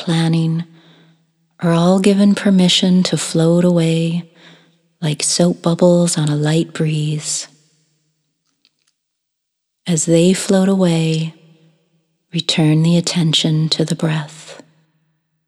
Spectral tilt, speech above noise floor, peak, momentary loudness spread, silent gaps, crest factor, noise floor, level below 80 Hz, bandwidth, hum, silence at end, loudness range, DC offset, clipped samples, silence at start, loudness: -5 dB/octave; 61 dB; 0 dBFS; 11 LU; none; 16 dB; -75 dBFS; -68 dBFS; 12.5 kHz; none; 0.95 s; 7 LU; under 0.1%; under 0.1%; 0 s; -15 LUFS